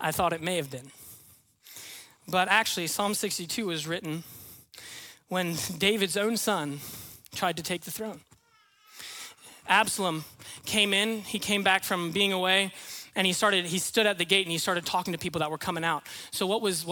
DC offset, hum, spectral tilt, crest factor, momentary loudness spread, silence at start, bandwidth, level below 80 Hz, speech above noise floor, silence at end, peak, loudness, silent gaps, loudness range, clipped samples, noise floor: under 0.1%; none; -2.5 dB/octave; 22 dB; 20 LU; 0 s; 18 kHz; -66 dBFS; 35 dB; 0 s; -8 dBFS; -27 LUFS; none; 6 LU; under 0.1%; -64 dBFS